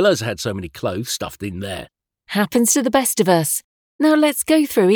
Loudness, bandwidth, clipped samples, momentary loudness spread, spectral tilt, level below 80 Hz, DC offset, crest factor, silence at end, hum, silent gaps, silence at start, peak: -18 LUFS; over 20 kHz; under 0.1%; 12 LU; -4 dB/octave; -52 dBFS; under 0.1%; 18 dB; 0 s; none; 3.64-3.99 s; 0 s; -2 dBFS